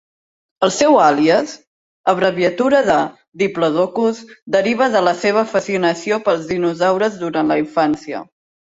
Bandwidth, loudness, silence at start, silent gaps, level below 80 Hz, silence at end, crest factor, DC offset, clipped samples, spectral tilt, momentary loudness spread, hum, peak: 8 kHz; -16 LUFS; 0.6 s; 1.67-2.04 s, 3.28-3.32 s, 4.42-4.47 s; -58 dBFS; 0.5 s; 16 dB; under 0.1%; under 0.1%; -4.5 dB/octave; 8 LU; none; -2 dBFS